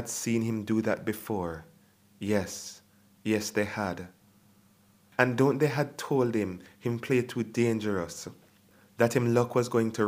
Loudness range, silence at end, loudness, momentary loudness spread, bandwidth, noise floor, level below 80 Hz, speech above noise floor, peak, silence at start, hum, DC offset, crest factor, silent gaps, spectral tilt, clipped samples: 5 LU; 0 s; -29 LUFS; 14 LU; 15.5 kHz; -62 dBFS; -66 dBFS; 34 dB; -4 dBFS; 0 s; none; under 0.1%; 26 dB; none; -5.5 dB/octave; under 0.1%